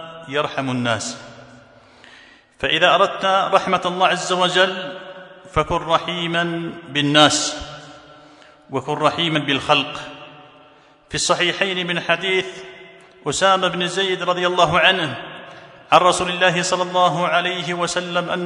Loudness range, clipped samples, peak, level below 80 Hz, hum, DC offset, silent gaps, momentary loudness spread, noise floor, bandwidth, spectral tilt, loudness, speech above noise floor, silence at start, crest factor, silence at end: 4 LU; under 0.1%; 0 dBFS; -50 dBFS; none; under 0.1%; none; 17 LU; -50 dBFS; 12 kHz; -3 dB/octave; -18 LUFS; 31 dB; 0 s; 20 dB; 0 s